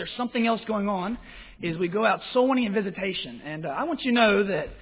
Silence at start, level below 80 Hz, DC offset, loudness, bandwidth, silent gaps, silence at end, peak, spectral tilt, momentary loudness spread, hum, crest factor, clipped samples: 0 s; -54 dBFS; under 0.1%; -25 LUFS; 4 kHz; none; 0 s; -8 dBFS; -9.5 dB/octave; 13 LU; none; 18 dB; under 0.1%